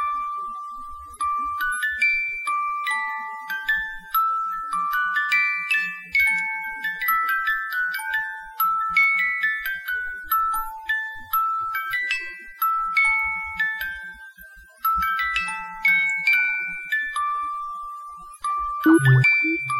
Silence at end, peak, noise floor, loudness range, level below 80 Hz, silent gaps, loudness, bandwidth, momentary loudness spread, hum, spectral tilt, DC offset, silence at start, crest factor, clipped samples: 0 s; -6 dBFS; -46 dBFS; 3 LU; -52 dBFS; none; -22 LUFS; 16.5 kHz; 13 LU; none; -5 dB/octave; under 0.1%; 0 s; 18 dB; under 0.1%